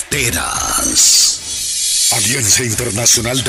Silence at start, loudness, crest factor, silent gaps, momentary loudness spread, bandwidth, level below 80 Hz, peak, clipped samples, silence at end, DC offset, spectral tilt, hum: 0 s; -11 LUFS; 14 dB; none; 9 LU; 16 kHz; -38 dBFS; -2 dBFS; under 0.1%; 0 s; under 0.1%; -1 dB/octave; none